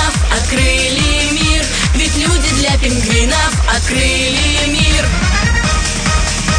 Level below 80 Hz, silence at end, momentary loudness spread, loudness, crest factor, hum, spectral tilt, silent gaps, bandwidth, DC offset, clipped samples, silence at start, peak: -16 dBFS; 0 s; 2 LU; -12 LUFS; 12 dB; none; -3 dB/octave; none; 10.5 kHz; under 0.1%; under 0.1%; 0 s; 0 dBFS